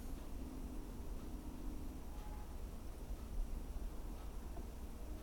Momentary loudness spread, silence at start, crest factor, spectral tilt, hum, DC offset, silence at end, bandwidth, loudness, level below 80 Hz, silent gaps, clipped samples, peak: 3 LU; 0 s; 14 dB; -6 dB/octave; none; under 0.1%; 0 s; 17.5 kHz; -51 LUFS; -46 dBFS; none; under 0.1%; -32 dBFS